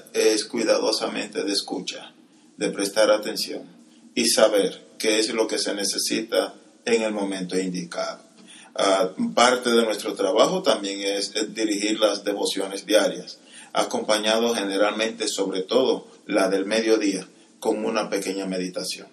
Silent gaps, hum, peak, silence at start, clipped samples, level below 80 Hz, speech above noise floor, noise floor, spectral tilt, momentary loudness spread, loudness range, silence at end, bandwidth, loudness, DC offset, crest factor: none; none; -2 dBFS; 0.15 s; under 0.1%; -80 dBFS; 23 dB; -46 dBFS; -2.5 dB/octave; 10 LU; 3 LU; 0.05 s; 13.5 kHz; -23 LUFS; under 0.1%; 22 dB